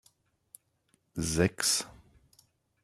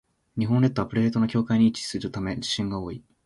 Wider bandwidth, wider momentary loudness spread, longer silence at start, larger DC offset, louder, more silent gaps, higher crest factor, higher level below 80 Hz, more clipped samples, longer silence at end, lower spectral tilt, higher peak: first, 15.5 kHz vs 11.5 kHz; first, 17 LU vs 9 LU; first, 1.15 s vs 0.35 s; neither; second, -29 LUFS vs -25 LUFS; neither; first, 24 dB vs 16 dB; about the same, -56 dBFS vs -52 dBFS; neither; first, 0.9 s vs 0.25 s; second, -3 dB/octave vs -6 dB/octave; about the same, -10 dBFS vs -8 dBFS